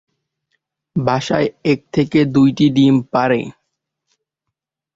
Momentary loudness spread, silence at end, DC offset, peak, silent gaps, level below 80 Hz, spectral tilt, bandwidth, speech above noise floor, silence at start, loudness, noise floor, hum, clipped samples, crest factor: 8 LU; 1.45 s; under 0.1%; -2 dBFS; none; -52 dBFS; -7 dB/octave; 7.6 kHz; 65 dB; 0.95 s; -16 LUFS; -80 dBFS; none; under 0.1%; 14 dB